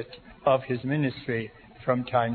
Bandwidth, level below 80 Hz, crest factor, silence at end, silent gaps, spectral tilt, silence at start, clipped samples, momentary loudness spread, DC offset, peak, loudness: 4.5 kHz; -58 dBFS; 18 dB; 0 s; none; -10.5 dB/octave; 0 s; under 0.1%; 10 LU; under 0.1%; -10 dBFS; -28 LUFS